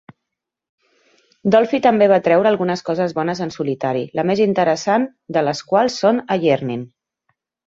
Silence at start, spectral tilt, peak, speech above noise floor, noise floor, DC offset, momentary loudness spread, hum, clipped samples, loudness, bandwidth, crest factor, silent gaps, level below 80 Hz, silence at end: 1.45 s; -6 dB/octave; -2 dBFS; 64 dB; -81 dBFS; under 0.1%; 9 LU; none; under 0.1%; -18 LUFS; 7.8 kHz; 16 dB; none; -62 dBFS; 0.8 s